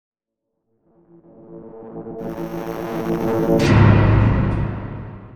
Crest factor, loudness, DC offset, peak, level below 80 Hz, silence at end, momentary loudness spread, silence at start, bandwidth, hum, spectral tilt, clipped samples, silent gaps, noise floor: 18 dB; -18 LUFS; under 0.1%; 0 dBFS; -30 dBFS; 0 s; 21 LU; 1.5 s; 13.5 kHz; none; -8 dB/octave; under 0.1%; none; -78 dBFS